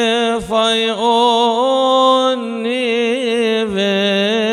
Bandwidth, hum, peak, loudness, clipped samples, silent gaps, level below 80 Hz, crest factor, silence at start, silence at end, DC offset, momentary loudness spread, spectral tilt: 12.5 kHz; none; -2 dBFS; -15 LUFS; under 0.1%; none; -50 dBFS; 12 dB; 0 s; 0 s; under 0.1%; 5 LU; -4 dB/octave